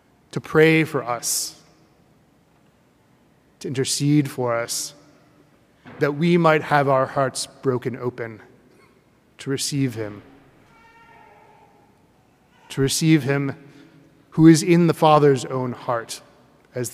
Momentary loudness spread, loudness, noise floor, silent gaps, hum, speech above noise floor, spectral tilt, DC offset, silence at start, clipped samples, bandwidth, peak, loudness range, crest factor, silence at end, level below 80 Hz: 18 LU; -20 LUFS; -58 dBFS; none; none; 39 dB; -5 dB/octave; under 0.1%; 0.35 s; under 0.1%; 16 kHz; 0 dBFS; 12 LU; 22 dB; 0 s; -58 dBFS